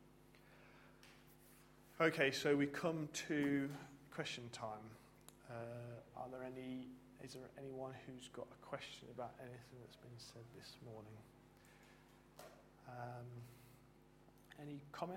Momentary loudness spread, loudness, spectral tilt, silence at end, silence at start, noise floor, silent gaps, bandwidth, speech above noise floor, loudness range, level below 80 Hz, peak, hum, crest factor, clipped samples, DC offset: 26 LU; -45 LUFS; -5 dB/octave; 0 s; 0 s; -67 dBFS; none; 16.5 kHz; 22 dB; 18 LU; -76 dBFS; -20 dBFS; none; 26 dB; under 0.1%; under 0.1%